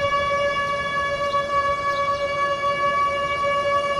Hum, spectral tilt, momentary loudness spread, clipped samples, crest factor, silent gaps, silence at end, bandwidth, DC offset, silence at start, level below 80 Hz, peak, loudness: none; -3.5 dB/octave; 2 LU; under 0.1%; 12 dB; none; 0 s; 11 kHz; under 0.1%; 0 s; -48 dBFS; -10 dBFS; -22 LUFS